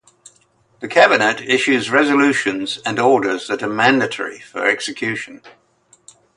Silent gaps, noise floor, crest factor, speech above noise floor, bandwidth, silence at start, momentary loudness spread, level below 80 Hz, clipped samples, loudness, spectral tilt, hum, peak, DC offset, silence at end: none; -57 dBFS; 18 dB; 40 dB; 11.5 kHz; 0.8 s; 11 LU; -64 dBFS; under 0.1%; -16 LUFS; -4 dB/octave; none; 0 dBFS; under 0.1%; 0.9 s